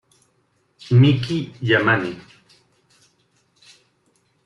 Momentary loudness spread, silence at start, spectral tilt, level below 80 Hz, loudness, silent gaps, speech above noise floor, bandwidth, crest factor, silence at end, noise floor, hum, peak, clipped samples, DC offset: 13 LU; 0.85 s; -7.5 dB/octave; -56 dBFS; -18 LUFS; none; 48 dB; 7.4 kHz; 18 dB; 2.25 s; -65 dBFS; none; -4 dBFS; under 0.1%; under 0.1%